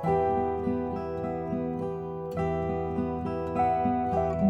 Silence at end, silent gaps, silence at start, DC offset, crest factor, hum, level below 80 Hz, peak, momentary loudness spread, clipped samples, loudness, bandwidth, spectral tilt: 0 s; none; 0 s; under 0.1%; 16 dB; none; -48 dBFS; -12 dBFS; 7 LU; under 0.1%; -29 LUFS; 8.4 kHz; -9.5 dB/octave